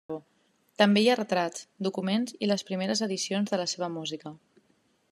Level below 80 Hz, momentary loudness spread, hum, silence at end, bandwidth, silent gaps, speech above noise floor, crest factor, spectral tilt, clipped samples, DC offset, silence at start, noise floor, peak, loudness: -80 dBFS; 14 LU; none; 0.75 s; 13 kHz; none; 41 dB; 24 dB; -4.5 dB/octave; under 0.1%; under 0.1%; 0.1 s; -69 dBFS; -6 dBFS; -28 LUFS